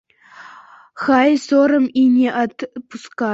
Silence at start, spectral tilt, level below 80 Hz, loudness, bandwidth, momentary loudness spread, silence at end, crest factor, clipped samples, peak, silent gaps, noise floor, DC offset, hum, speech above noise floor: 0.4 s; -5 dB/octave; -62 dBFS; -16 LUFS; 7.8 kHz; 16 LU; 0 s; 16 dB; under 0.1%; -2 dBFS; none; -43 dBFS; under 0.1%; none; 27 dB